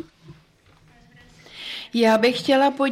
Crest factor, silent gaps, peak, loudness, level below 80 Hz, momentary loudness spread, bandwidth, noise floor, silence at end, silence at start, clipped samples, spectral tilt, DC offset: 16 dB; none; -8 dBFS; -20 LUFS; -62 dBFS; 18 LU; 16 kHz; -56 dBFS; 0 s; 0.3 s; under 0.1%; -4.5 dB/octave; under 0.1%